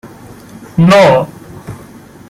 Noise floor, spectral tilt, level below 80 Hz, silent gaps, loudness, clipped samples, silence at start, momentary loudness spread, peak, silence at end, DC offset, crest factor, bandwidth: -35 dBFS; -6.5 dB/octave; -44 dBFS; none; -9 LUFS; under 0.1%; 0.05 s; 25 LU; 0 dBFS; 0.5 s; under 0.1%; 12 dB; 15 kHz